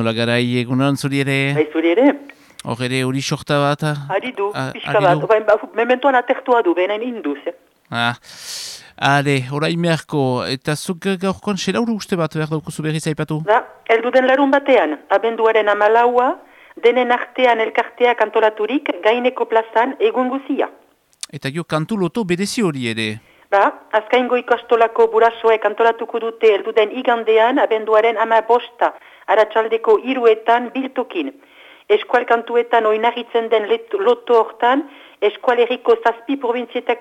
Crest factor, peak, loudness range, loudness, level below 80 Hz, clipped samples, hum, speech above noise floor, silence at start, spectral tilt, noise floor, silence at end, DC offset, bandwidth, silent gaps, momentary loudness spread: 14 dB; -2 dBFS; 5 LU; -17 LUFS; -62 dBFS; under 0.1%; none; 20 dB; 0 s; -5.5 dB/octave; -37 dBFS; 0 s; under 0.1%; 14 kHz; none; 9 LU